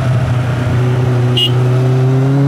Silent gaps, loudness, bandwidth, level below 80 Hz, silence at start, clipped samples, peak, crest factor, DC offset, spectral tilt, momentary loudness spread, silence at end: none; -13 LUFS; 10.5 kHz; -38 dBFS; 0 s; under 0.1%; -2 dBFS; 10 dB; under 0.1%; -7 dB/octave; 3 LU; 0 s